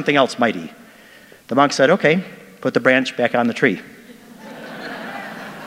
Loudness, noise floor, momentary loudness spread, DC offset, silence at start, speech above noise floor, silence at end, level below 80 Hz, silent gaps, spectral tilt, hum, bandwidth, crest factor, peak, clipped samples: -18 LUFS; -45 dBFS; 19 LU; under 0.1%; 0 s; 28 dB; 0 s; -66 dBFS; none; -5 dB/octave; none; 16 kHz; 20 dB; 0 dBFS; under 0.1%